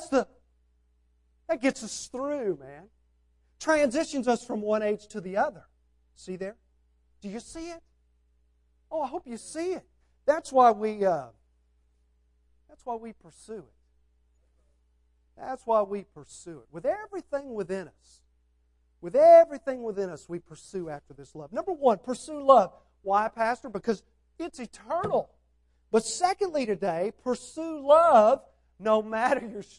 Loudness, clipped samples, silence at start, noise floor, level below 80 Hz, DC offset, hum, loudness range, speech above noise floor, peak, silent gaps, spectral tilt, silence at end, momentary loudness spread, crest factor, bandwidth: -26 LUFS; under 0.1%; 0 s; -68 dBFS; -64 dBFS; under 0.1%; none; 15 LU; 41 dB; -6 dBFS; none; -4.5 dB/octave; 0.15 s; 21 LU; 22 dB; 11.5 kHz